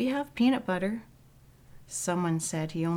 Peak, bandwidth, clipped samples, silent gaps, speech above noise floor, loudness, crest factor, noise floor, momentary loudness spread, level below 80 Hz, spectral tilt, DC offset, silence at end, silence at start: -14 dBFS; 16.5 kHz; under 0.1%; none; 28 dB; -30 LUFS; 16 dB; -57 dBFS; 8 LU; -60 dBFS; -5 dB/octave; under 0.1%; 0 s; 0 s